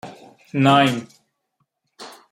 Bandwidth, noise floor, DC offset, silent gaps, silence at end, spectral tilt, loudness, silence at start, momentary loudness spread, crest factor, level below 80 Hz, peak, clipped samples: 15 kHz; -72 dBFS; under 0.1%; none; 0.2 s; -6 dB/octave; -18 LUFS; 0.05 s; 25 LU; 20 dB; -62 dBFS; -2 dBFS; under 0.1%